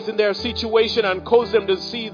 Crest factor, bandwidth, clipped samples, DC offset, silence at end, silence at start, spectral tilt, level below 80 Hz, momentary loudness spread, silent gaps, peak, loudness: 16 dB; 5.2 kHz; under 0.1%; under 0.1%; 0 s; 0 s; -5 dB/octave; -48 dBFS; 6 LU; none; -2 dBFS; -19 LUFS